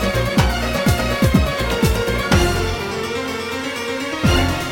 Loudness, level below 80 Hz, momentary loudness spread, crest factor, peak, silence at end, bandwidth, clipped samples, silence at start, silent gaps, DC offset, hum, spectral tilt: -19 LUFS; -26 dBFS; 7 LU; 16 dB; -2 dBFS; 0 s; 17.5 kHz; under 0.1%; 0 s; none; under 0.1%; none; -5 dB/octave